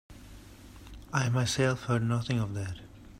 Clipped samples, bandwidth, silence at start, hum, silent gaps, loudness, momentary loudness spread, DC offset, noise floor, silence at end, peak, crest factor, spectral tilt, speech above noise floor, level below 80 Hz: under 0.1%; 14.5 kHz; 0.1 s; none; none; -30 LUFS; 23 LU; under 0.1%; -50 dBFS; 0 s; -12 dBFS; 20 dB; -5.5 dB/octave; 21 dB; -52 dBFS